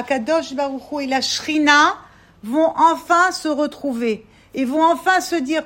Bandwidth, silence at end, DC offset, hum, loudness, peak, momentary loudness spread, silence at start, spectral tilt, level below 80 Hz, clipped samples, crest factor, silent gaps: 16.5 kHz; 0 s; under 0.1%; none; -18 LUFS; 0 dBFS; 11 LU; 0 s; -2.5 dB/octave; -58 dBFS; under 0.1%; 18 dB; none